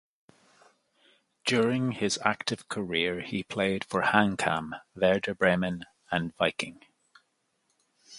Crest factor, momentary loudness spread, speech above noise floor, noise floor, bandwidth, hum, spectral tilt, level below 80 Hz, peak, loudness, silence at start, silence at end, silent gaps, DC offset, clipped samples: 26 dB; 9 LU; 47 dB; -75 dBFS; 11.5 kHz; none; -4.5 dB/octave; -62 dBFS; -4 dBFS; -28 LUFS; 1.45 s; 0 s; none; under 0.1%; under 0.1%